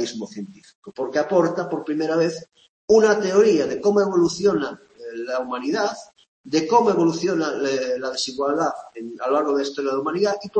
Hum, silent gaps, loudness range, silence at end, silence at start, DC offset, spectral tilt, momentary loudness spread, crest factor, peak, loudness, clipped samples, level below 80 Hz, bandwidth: none; 0.75-0.82 s, 2.69-2.88 s, 6.28-6.44 s; 3 LU; 0 s; 0 s; under 0.1%; -5 dB/octave; 17 LU; 18 dB; -4 dBFS; -21 LUFS; under 0.1%; -64 dBFS; 8.8 kHz